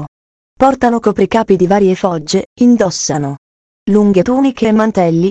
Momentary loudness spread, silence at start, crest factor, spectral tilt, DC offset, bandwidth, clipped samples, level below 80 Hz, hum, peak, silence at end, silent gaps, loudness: 8 LU; 0 s; 12 dB; -6 dB/octave; under 0.1%; 8.6 kHz; 0.2%; -44 dBFS; none; 0 dBFS; 0 s; 0.08-0.56 s, 2.46-2.56 s, 3.38-3.86 s; -12 LUFS